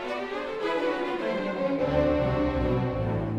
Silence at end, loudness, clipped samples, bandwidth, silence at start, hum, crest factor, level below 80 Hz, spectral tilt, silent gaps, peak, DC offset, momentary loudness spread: 0 s; -27 LUFS; under 0.1%; 9.8 kHz; 0 s; none; 14 dB; -40 dBFS; -8 dB/octave; none; -12 dBFS; under 0.1%; 6 LU